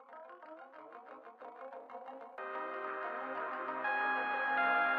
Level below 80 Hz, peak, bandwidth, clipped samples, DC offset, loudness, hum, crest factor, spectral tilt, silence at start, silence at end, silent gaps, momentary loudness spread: under -90 dBFS; -20 dBFS; 6.2 kHz; under 0.1%; under 0.1%; -36 LUFS; none; 18 dB; -5 dB/octave; 0 s; 0 s; none; 20 LU